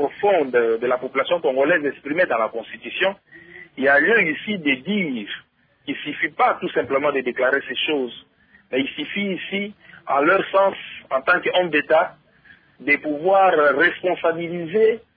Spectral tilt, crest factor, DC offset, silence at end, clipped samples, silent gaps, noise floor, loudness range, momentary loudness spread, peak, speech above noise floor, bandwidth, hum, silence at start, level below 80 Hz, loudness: -8.5 dB/octave; 16 dB; under 0.1%; 0.2 s; under 0.1%; none; -52 dBFS; 4 LU; 12 LU; -6 dBFS; 32 dB; 5 kHz; none; 0 s; -66 dBFS; -20 LUFS